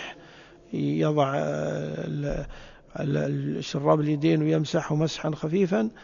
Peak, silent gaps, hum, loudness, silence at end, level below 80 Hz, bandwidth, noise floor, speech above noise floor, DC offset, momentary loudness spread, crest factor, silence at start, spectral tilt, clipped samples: -6 dBFS; none; none; -26 LUFS; 0 s; -48 dBFS; 7.2 kHz; -50 dBFS; 24 dB; under 0.1%; 12 LU; 20 dB; 0 s; -7 dB/octave; under 0.1%